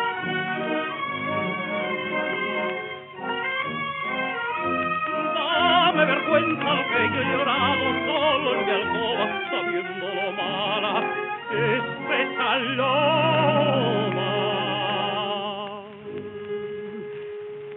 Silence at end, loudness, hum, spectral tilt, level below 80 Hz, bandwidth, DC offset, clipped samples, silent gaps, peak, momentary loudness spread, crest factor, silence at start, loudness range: 0 s; -24 LUFS; none; -2 dB/octave; -66 dBFS; 4.2 kHz; under 0.1%; under 0.1%; none; -6 dBFS; 13 LU; 20 dB; 0 s; 6 LU